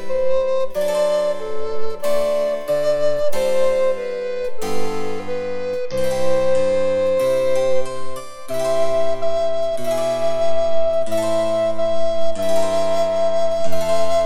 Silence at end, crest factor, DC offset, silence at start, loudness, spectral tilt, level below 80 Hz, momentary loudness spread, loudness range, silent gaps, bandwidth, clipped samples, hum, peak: 0 s; 10 dB; under 0.1%; 0 s; -21 LUFS; -4.5 dB/octave; -44 dBFS; 8 LU; 2 LU; none; 16.5 kHz; under 0.1%; none; -4 dBFS